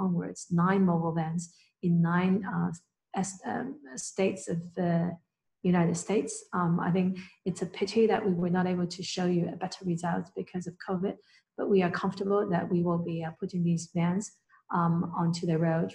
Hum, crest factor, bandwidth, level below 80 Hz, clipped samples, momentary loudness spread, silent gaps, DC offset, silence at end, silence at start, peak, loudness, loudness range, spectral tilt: none; 16 dB; 10.5 kHz; -68 dBFS; under 0.1%; 11 LU; none; under 0.1%; 0 s; 0 s; -12 dBFS; -30 LUFS; 3 LU; -6.5 dB/octave